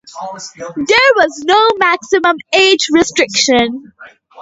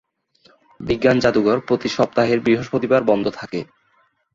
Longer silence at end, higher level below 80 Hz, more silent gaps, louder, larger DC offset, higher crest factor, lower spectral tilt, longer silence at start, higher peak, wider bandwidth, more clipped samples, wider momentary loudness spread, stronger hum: second, 0 s vs 0.7 s; about the same, -50 dBFS vs -50 dBFS; neither; first, -11 LUFS vs -19 LUFS; neither; about the same, 14 dB vs 18 dB; second, -1.5 dB/octave vs -6 dB/octave; second, 0.05 s vs 0.8 s; about the same, 0 dBFS vs -2 dBFS; about the same, 8 kHz vs 7.6 kHz; neither; first, 17 LU vs 13 LU; neither